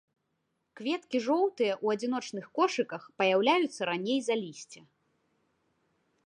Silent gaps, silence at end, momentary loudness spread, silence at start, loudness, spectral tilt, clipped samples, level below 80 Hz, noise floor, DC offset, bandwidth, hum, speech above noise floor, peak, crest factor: none; 1.5 s; 11 LU; 0.75 s; -30 LUFS; -4 dB/octave; under 0.1%; -86 dBFS; -79 dBFS; under 0.1%; 11 kHz; none; 50 dB; -12 dBFS; 20 dB